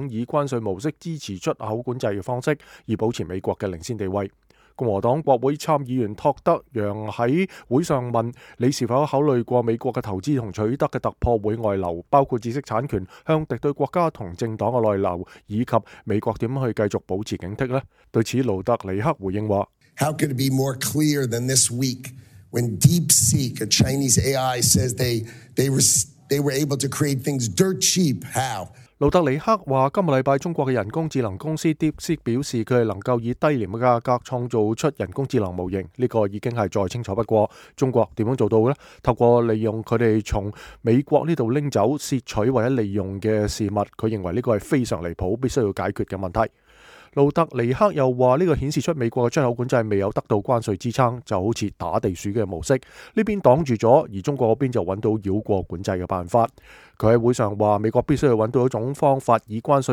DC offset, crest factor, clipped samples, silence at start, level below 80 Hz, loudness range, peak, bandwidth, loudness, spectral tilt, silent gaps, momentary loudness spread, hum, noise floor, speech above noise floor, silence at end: under 0.1%; 20 dB; under 0.1%; 0 s; -46 dBFS; 5 LU; 0 dBFS; 16 kHz; -22 LUFS; -5 dB/octave; none; 9 LU; none; -49 dBFS; 27 dB; 0 s